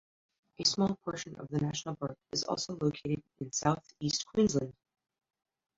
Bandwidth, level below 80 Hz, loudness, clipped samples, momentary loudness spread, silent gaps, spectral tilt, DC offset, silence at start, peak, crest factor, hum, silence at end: 7.8 kHz; -64 dBFS; -33 LUFS; under 0.1%; 10 LU; none; -4.5 dB/octave; under 0.1%; 0.6 s; -12 dBFS; 22 dB; none; 1.05 s